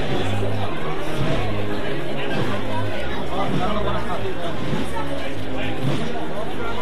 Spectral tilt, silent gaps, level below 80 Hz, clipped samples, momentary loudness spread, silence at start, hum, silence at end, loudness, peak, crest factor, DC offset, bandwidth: -6 dB/octave; none; -38 dBFS; under 0.1%; 4 LU; 0 s; none; 0 s; -26 LUFS; -8 dBFS; 14 dB; 10%; 14 kHz